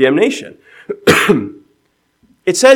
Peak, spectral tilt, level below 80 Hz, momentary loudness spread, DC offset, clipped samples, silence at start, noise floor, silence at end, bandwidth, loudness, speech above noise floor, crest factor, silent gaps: 0 dBFS; -4 dB/octave; -52 dBFS; 18 LU; under 0.1%; 0.3%; 0 s; -61 dBFS; 0 s; 19 kHz; -13 LUFS; 50 dB; 14 dB; none